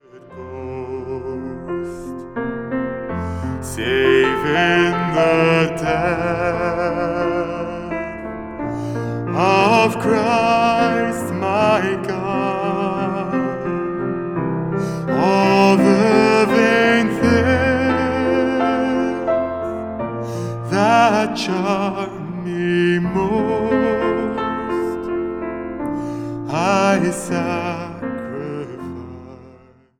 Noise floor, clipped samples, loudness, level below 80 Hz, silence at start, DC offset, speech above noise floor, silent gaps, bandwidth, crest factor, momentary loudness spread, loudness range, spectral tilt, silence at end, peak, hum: -48 dBFS; under 0.1%; -18 LUFS; -44 dBFS; 0.15 s; under 0.1%; 31 dB; none; 16 kHz; 18 dB; 13 LU; 7 LU; -6 dB/octave; 0.5 s; 0 dBFS; none